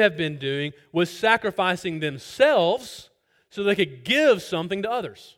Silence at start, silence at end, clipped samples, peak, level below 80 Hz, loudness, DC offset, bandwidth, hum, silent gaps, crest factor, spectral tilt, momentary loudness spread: 0 s; 0.25 s; under 0.1%; -4 dBFS; -64 dBFS; -23 LUFS; under 0.1%; 16.5 kHz; none; none; 20 dB; -5 dB/octave; 11 LU